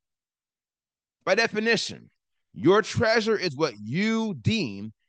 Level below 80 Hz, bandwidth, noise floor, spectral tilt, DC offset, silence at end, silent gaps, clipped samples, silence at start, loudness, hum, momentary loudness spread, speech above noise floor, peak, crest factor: -64 dBFS; 9.6 kHz; under -90 dBFS; -5 dB/octave; under 0.1%; 0.15 s; none; under 0.1%; 1.25 s; -25 LUFS; none; 7 LU; over 65 dB; -8 dBFS; 18 dB